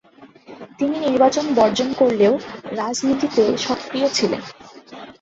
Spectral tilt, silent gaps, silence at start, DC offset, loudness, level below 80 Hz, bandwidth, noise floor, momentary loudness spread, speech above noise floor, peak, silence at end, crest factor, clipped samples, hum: -4 dB/octave; none; 0.2 s; under 0.1%; -19 LUFS; -58 dBFS; 8 kHz; -44 dBFS; 19 LU; 26 dB; -2 dBFS; 0.1 s; 18 dB; under 0.1%; none